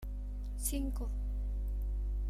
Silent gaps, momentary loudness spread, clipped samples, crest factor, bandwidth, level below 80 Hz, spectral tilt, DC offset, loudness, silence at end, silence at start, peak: none; 7 LU; under 0.1%; 16 dB; 15 kHz; -36 dBFS; -5.5 dB/octave; under 0.1%; -39 LUFS; 0 s; 0 s; -20 dBFS